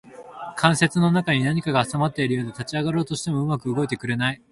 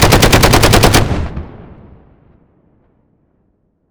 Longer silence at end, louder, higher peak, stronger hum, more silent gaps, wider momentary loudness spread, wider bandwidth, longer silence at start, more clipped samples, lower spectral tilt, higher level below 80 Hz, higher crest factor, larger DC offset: second, 0.15 s vs 2.3 s; second, -23 LUFS vs -9 LUFS; about the same, -2 dBFS vs 0 dBFS; neither; neither; second, 8 LU vs 20 LU; second, 11.5 kHz vs over 20 kHz; about the same, 0.1 s vs 0 s; second, under 0.1% vs 0.9%; first, -5.5 dB/octave vs -4 dB/octave; second, -56 dBFS vs -22 dBFS; first, 22 dB vs 14 dB; neither